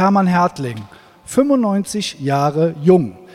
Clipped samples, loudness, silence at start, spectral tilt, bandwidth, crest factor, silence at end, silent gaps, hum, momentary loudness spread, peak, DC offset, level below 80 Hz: under 0.1%; -17 LUFS; 0 s; -6.5 dB/octave; 14.5 kHz; 16 dB; 0.1 s; none; none; 10 LU; 0 dBFS; under 0.1%; -56 dBFS